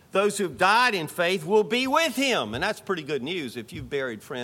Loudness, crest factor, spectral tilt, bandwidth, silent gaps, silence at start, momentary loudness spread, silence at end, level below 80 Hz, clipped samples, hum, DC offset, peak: -24 LUFS; 18 dB; -3.5 dB/octave; 17 kHz; none; 0.15 s; 11 LU; 0 s; -58 dBFS; under 0.1%; none; under 0.1%; -8 dBFS